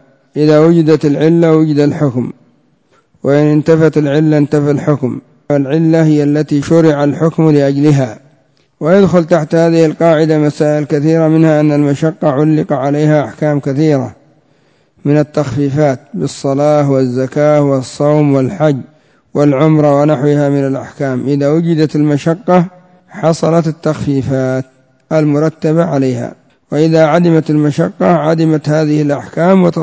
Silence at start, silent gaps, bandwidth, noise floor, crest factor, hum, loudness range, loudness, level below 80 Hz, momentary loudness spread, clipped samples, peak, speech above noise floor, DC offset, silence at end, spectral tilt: 0.35 s; none; 8 kHz; -53 dBFS; 10 dB; none; 3 LU; -11 LUFS; -50 dBFS; 7 LU; 0.2%; 0 dBFS; 43 dB; under 0.1%; 0 s; -8 dB/octave